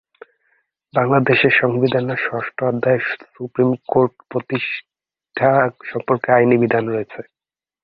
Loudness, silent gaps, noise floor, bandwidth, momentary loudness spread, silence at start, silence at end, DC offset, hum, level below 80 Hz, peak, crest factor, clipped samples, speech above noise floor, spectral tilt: -18 LUFS; none; under -90 dBFS; 5.2 kHz; 13 LU; 0.95 s; 0.6 s; under 0.1%; none; -60 dBFS; -2 dBFS; 18 dB; under 0.1%; over 72 dB; -10 dB/octave